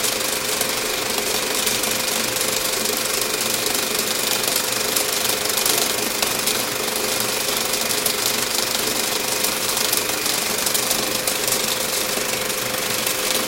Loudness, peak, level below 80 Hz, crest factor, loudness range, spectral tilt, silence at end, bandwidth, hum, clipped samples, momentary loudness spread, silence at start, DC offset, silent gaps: -19 LUFS; 0 dBFS; -52 dBFS; 22 dB; 1 LU; -0.5 dB/octave; 0 s; 16.5 kHz; none; under 0.1%; 2 LU; 0 s; under 0.1%; none